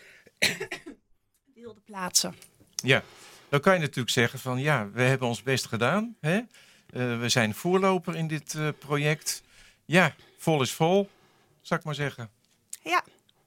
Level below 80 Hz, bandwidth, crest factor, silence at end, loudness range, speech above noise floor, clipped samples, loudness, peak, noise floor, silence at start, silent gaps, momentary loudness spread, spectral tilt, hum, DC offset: -68 dBFS; 16.5 kHz; 24 dB; 0.45 s; 3 LU; 41 dB; under 0.1%; -27 LUFS; -4 dBFS; -67 dBFS; 0.4 s; none; 13 LU; -4 dB/octave; none; under 0.1%